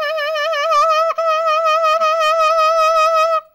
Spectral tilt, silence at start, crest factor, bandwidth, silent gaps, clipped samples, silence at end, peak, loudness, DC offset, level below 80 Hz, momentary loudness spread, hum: 2 dB/octave; 0 s; 8 dB; 16.5 kHz; none; under 0.1%; 0.1 s; -8 dBFS; -14 LUFS; under 0.1%; -60 dBFS; 5 LU; none